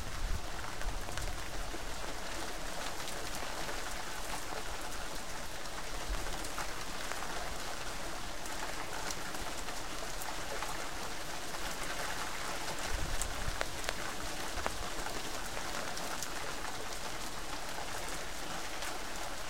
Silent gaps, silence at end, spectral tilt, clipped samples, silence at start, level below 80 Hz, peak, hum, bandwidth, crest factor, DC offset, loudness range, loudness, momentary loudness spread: none; 0 s; -2 dB/octave; under 0.1%; 0 s; -46 dBFS; -10 dBFS; none; 16.5 kHz; 30 dB; 1%; 2 LU; -40 LUFS; 3 LU